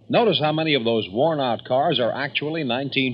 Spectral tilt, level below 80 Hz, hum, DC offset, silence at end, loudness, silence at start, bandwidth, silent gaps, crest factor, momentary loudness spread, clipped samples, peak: -8.5 dB/octave; -68 dBFS; none; under 0.1%; 0 s; -21 LUFS; 0.1 s; 5.4 kHz; none; 16 dB; 5 LU; under 0.1%; -6 dBFS